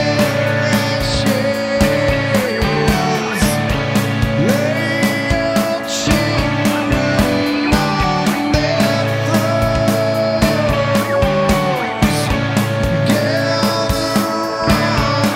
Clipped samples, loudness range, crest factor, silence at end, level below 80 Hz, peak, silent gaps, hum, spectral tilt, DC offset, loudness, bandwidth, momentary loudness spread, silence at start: under 0.1%; 1 LU; 16 dB; 0 s; -28 dBFS; 0 dBFS; none; none; -5 dB/octave; under 0.1%; -15 LUFS; 16.5 kHz; 2 LU; 0 s